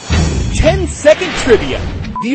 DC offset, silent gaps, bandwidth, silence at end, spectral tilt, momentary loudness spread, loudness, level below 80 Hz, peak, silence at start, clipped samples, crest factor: under 0.1%; none; 8.8 kHz; 0 s; -5 dB/octave; 10 LU; -13 LUFS; -20 dBFS; 0 dBFS; 0 s; 0.4%; 12 dB